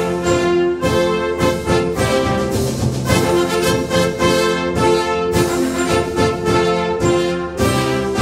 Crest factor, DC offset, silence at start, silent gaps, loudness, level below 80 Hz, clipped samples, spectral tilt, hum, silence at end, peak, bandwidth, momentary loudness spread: 16 dB; under 0.1%; 0 s; none; -16 LUFS; -34 dBFS; under 0.1%; -5 dB/octave; none; 0 s; 0 dBFS; 16 kHz; 3 LU